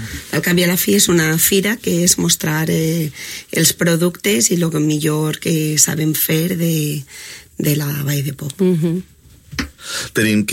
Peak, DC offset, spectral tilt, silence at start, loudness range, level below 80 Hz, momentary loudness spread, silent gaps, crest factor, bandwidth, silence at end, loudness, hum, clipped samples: 0 dBFS; under 0.1%; -4 dB/octave; 0 s; 5 LU; -46 dBFS; 12 LU; none; 16 dB; 16.5 kHz; 0 s; -16 LUFS; none; under 0.1%